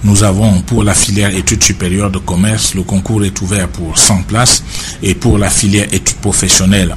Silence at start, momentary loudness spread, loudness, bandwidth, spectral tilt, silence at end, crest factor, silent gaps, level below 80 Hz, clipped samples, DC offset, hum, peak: 0 s; 7 LU; -10 LUFS; 16 kHz; -3.5 dB/octave; 0 s; 10 dB; none; -24 dBFS; 0.2%; under 0.1%; none; 0 dBFS